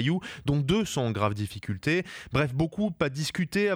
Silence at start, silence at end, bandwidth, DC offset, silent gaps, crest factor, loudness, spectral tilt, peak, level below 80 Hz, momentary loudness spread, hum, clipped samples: 0 s; 0 s; 15.5 kHz; under 0.1%; none; 16 dB; -28 LUFS; -6 dB/octave; -10 dBFS; -50 dBFS; 5 LU; none; under 0.1%